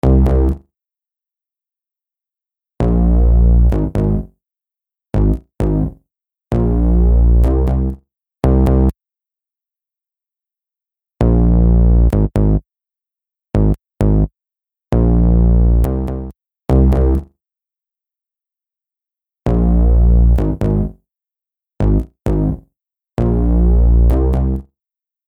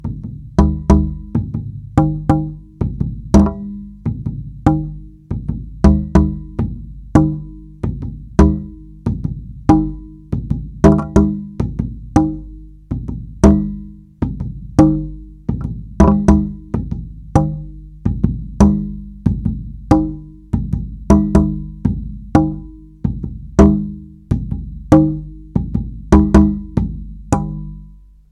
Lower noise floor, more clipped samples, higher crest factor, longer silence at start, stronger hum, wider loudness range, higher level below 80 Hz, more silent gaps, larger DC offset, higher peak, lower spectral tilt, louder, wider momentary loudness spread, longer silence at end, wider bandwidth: first, -89 dBFS vs -40 dBFS; neither; about the same, 14 dB vs 16 dB; about the same, 0.05 s vs 0 s; second, none vs 50 Hz at -35 dBFS; about the same, 4 LU vs 3 LU; first, -16 dBFS vs -24 dBFS; neither; neither; about the same, 0 dBFS vs 0 dBFS; first, -10.5 dB/octave vs -9 dB/octave; about the same, -15 LUFS vs -17 LUFS; second, 10 LU vs 16 LU; first, 0.7 s vs 0.4 s; second, 3.1 kHz vs 10.5 kHz